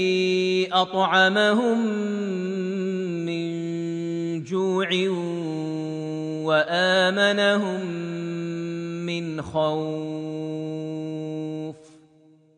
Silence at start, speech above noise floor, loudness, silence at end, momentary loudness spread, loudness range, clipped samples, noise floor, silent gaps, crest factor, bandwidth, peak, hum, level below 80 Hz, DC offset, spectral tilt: 0 s; 34 dB; -24 LUFS; 0.7 s; 12 LU; 6 LU; under 0.1%; -56 dBFS; none; 18 dB; 10 kHz; -6 dBFS; none; -66 dBFS; under 0.1%; -5.5 dB/octave